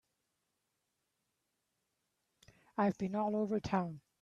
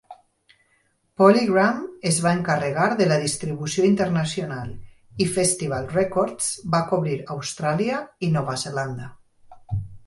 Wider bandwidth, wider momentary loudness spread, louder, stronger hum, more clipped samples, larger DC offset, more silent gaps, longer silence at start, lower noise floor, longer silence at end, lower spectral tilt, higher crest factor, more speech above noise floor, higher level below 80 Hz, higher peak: second, 7.6 kHz vs 11.5 kHz; second, 7 LU vs 13 LU; second, -36 LUFS vs -22 LUFS; neither; neither; neither; neither; first, 2.75 s vs 0.1 s; first, -85 dBFS vs -66 dBFS; about the same, 0.2 s vs 0.1 s; first, -7.5 dB/octave vs -5 dB/octave; about the same, 20 dB vs 20 dB; first, 50 dB vs 44 dB; second, -70 dBFS vs -52 dBFS; second, -20 dBFS vs -2 dBFS